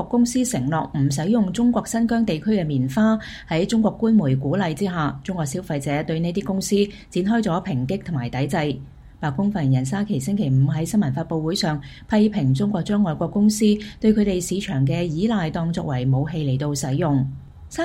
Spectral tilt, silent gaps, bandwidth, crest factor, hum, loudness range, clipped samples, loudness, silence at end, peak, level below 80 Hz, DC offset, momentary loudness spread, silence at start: -6.5 dB/octave; none; 15.5 kHz; 16 dB; none; 3 LU; under 0.1%; -22 LUFS; 0 s; -6 dBFS; -46 dBFS; under 0.1%; 7 LU; 0 s